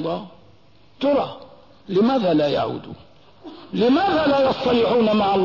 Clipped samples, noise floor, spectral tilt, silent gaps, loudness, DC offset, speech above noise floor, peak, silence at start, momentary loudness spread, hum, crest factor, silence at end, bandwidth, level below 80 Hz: under 0.1%; -54 dBFS; -7.5 dB/octave; none; -20 LUFS; 0.3%; 34 dB; -8 dBFS; 0 s; 14 LU; none; 12 dB; 0 s; 6 kHz; -54 dBFS